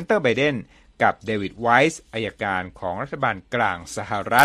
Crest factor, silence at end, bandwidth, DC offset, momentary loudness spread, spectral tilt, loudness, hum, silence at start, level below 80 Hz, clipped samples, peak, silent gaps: 22 dB; 0 s; 13.5 kHz; under 0.1%; 11 LU; -4.5 dB/octave; -23 LUFS; none; 0 s; -54 dBFS; under 0.1%; 0 dBFS; none